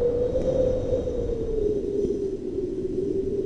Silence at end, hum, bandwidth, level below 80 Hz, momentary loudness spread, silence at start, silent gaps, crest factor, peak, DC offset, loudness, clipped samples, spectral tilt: 0 s; none; 9.2 kHz; -36 dBFS; 5 LU; 0 s; none; 14 dB; -12 dBFS; under 0.1%; -26 LUFS; under 0.1%; -8.5 dB/octave